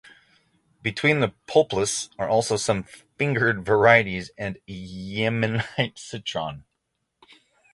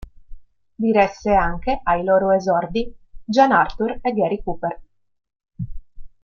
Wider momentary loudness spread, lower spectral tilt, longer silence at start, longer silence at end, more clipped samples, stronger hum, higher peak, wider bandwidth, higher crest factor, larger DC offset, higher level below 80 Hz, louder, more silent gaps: second, 14 LU vs 18 LU; second, -4.5 dB/octave vs -6.5 dB/octave; first, 0.85 s vs 0.3 s; first, 1.15 s vs 0.15 s; neither; neither; about the same, -2 dBFS vs -2 dBFS; first, 11.5 kHz vs 7.2 kHz; about the same, 22 dB vs 18 dB; neither; second, -54 dBFS vs -38 dBFS; second, -23 LUFS vs -19 LUFS; neither